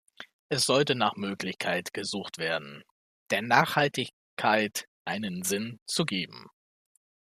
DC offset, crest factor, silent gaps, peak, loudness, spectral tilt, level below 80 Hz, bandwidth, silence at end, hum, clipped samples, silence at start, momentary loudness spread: under 0.1%; 26 dB; 0.33-0.50 s, 2.91-3.26 s, 4.13-4.37 s, 4.88-5.05 s, 5.82-5.86 s; -6 dBFS; -28 LUFS; -3.5 dB/octave; -72 dBFS; 15 kHz; 0.9 s; none; under 0.1%; 0.2 s; 12 LU